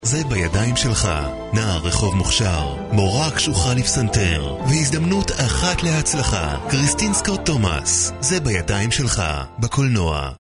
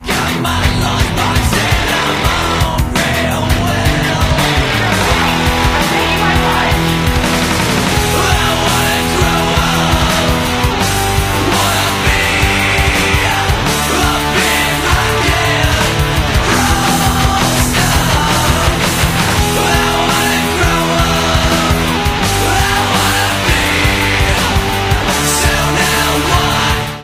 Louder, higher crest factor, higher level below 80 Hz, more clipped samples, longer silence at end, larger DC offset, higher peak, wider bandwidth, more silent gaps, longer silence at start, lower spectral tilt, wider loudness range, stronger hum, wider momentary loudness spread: second, -19 LUFS vs -12 LUFS; about the same, 14 dB vs 12 dB; second, -30 dBFS vs -22 dBFS; neither; about the same, 0.05 s vs 0 s; neither; second, -4 dBFS vs 0 dBFS; second, 11 kHz vs 16 kHz; neither; about the same, 0 s vs 0 s; about the same, -4 dB/octave vs -3.5 dB/octave; about the same, 1 LU vs 1 LU; neither; about the same, 4 LU vs 2 LU